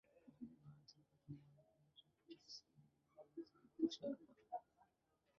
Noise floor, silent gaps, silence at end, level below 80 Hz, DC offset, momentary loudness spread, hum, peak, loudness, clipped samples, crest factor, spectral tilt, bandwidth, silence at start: -84 dBFS; none; 0.75 s; -88 dBFS; under 0.1%; 21 LU; none; -28 dBFS; -52 LUFS; under 0.1%; 26 dB; -5.5 dB/octave; 7 kHz; 0.15 s